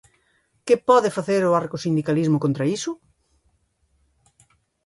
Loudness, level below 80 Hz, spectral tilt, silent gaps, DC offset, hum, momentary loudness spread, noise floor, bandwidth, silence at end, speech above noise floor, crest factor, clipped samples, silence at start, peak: -21 LUFS; -64 dBFS; -6.5 dB/octave; none; under 0.1%; none; 12 LU; -67 dBFS; 11.5 kHz; 1.9 s; 46 dB; 20 dB; under 0.1%; 0.65 s; -4 dBFS